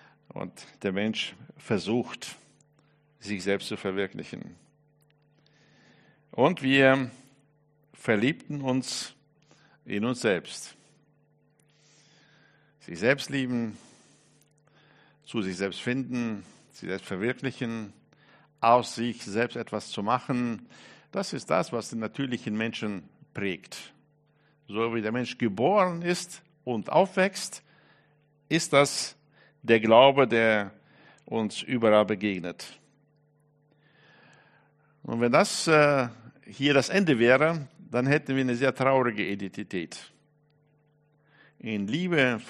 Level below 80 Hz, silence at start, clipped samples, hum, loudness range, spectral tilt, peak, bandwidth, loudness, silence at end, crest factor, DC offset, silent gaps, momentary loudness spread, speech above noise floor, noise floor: -70 dBFS; 0.35 s; under 0.1%; none; 11 LU; -5 dB/octave; -4 dBFS; 13 kHz; -27 LUFS; 0 s; 24 dB; under 0.1%; none; 18 LU; 40 dB; -66 dBFS